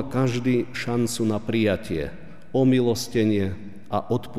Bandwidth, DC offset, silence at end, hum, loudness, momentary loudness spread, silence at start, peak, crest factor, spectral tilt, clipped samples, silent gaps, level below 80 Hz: 15.5 kHz; 1%; 0 s; none; -24 LUFS; 10 LU; 0 s; -10 dBFS; 14 dB; -6 dB/octave; under 0.1%; none; -50 dBFS